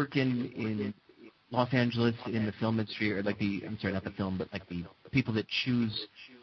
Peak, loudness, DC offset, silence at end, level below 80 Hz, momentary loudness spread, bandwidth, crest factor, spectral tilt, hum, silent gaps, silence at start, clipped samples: -12 dBFS; -32 LUFS; under 0.1%; 0.05 s; -62 dBFS; 10 LU; 6.2 kHz; 20 dB; -7.5 dB/octave; none; none; 0 s; under 0.1%